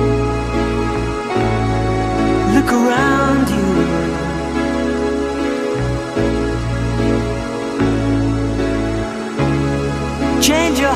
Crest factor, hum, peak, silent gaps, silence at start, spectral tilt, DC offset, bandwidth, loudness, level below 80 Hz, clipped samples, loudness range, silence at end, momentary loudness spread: 16 dB; none; -2 dBFS; none; 0 s; -5.5 dB/octave; under 0.1%; 16 kHz; -17 LUFS; -28 dBFS; under 0.1%; 3 LU; 0 s; 6 LU